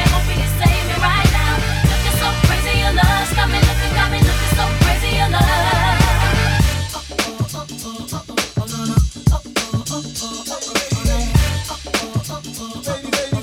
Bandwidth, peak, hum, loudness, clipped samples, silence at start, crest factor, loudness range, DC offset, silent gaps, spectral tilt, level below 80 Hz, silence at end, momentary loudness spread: 17 kHz; 0 dBFS; none; -17 LUFS; under 0.1%; 0 s; 16 dB; 6 LU; under 0.1%; none; -4.5 dB/octave; -22 dBFS; 0 s; 10 LU